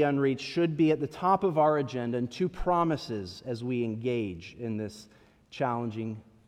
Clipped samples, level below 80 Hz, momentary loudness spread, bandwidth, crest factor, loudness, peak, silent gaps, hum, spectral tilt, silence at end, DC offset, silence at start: under 0.1%; -52 dBFS; 12 LU; 11 kHz; 18 dB; -30 LUFS; -12 dBFS; none; none; -7 dB/octave; 0.25 s; under 0.1%; 0 s